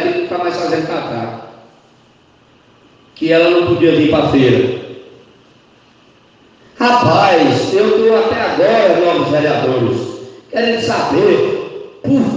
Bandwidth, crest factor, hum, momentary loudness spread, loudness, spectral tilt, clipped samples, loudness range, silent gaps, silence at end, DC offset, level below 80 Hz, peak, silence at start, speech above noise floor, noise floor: 9 kHz; 14 dB; none; 12 LU; -13 LUFS; -6 dB/octave; under 0.1%; 5 LU; none; 0 s; under 0.1%; -50 dBFS; 0 dBFS; 0 s; 37 dB; -49 dBFS